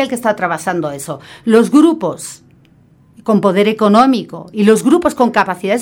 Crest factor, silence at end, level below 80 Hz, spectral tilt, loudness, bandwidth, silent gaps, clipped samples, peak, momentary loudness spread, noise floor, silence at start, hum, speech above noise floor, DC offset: 14 dB; 0 s; -54 dBFS; -5.5 dB/octave; -13 LUFS; 18 kHz; none; under 0.1%; 0 dBFS; 15 LU; -48 dBFS; 0 s; none; 35 dB; under 0.1%